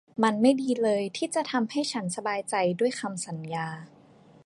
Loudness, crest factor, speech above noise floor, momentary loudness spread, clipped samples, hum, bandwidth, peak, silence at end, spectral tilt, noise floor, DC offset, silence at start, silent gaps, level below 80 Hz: -27 LUFS; 20 dB; 28 dB; 10 LU; under 0.1%; none; 11.5 kHz; -8 dBFS; 0.6 s; -4.5 dB/octave; -55 dBFS; under 0.1%; 0.15 s; none; -76 dBFS